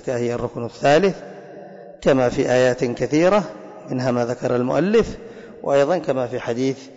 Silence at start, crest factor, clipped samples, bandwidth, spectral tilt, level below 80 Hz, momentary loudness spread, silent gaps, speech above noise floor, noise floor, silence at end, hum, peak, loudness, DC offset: 0.05 s; 12 dB; under 0.1%; 8 kHz; -6 dB/octave; -48 dBFS; 20 LU; none; 20 dB; -39 dBFS; 0.05 s; none; -8 dBFS; -20 LUFS; under 0.1%